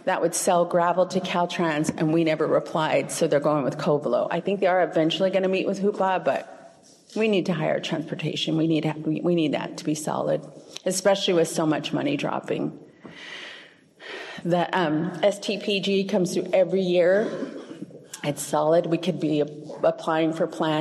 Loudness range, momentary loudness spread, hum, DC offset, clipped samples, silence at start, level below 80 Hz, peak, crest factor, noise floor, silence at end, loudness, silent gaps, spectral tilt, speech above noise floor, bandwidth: 4 LU; 12 LU; none; under 0.1%; under 0.1%; 0.05 s; -72 dBFS; -8 dBFS; 16 dB; -51 dBFS; 0 s; -24 LUFS; none; -5 dB/octave; 27 dB; 13 kHz